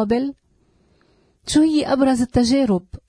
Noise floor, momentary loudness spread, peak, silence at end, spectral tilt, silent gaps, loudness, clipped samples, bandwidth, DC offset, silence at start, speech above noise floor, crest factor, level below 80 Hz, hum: -60 dBFS; 7 LU; -4 dBFS; 0.1 s; -5.5 dB/octave; none; -18 LUFS; under 0.1%; 10.5 kHz; under 0.1%; 0 s; 42 dB; 16 dB; -42 dBFS; none